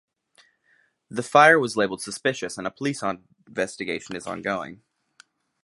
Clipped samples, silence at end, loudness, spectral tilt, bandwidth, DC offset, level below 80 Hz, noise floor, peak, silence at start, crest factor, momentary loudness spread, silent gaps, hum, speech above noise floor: under 0.1%; 0.9 s; -23 LUFS; -4 dB/octave; 11.5 kHz; under 0.1%; -66 dBFS; -65 dBFS; -2 dBFS; 1.1 s; 24 dB; 17 LU; none; none; 41 dB